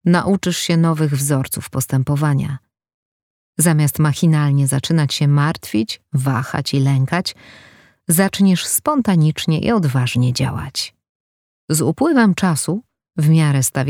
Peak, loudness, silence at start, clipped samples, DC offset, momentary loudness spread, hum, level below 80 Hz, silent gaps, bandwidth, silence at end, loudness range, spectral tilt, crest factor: -2 dBFS; -17 LUFS; 0.05 s; under 0.1%; under 0.1%; 8 LU; none; -50 dBFS; 2.94-3.53 s, 11.09-11.68 s; 17.5 kHz; 0 s; 2 LU; -5.5 dB/octave; 16 dB